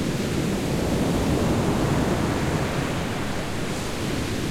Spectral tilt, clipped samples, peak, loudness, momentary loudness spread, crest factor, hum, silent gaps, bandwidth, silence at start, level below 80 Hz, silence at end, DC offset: -5.5 dB/octave; under 0.1%; -10 dBFS; -25 LUFS; 5 LU; 14 dB; none; none; 16.5 kHz; 0 s; -36 dBFS; 0 s; under 0.1%